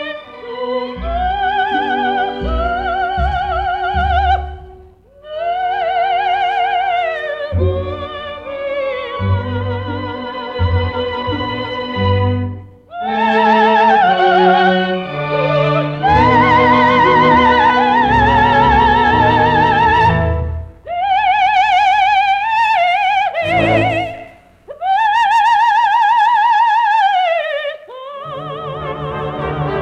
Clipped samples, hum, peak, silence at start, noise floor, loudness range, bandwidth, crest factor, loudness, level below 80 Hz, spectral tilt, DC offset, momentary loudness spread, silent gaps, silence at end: under 0.1%; none; -2 dBFS; 0 s; -42 dBFS; 9 LU; 9 kHz; 14 dB; -14 LUFS; -32 dBFS; -6.5 dB/octave; under 0.1%; 14 LU; none; 0 s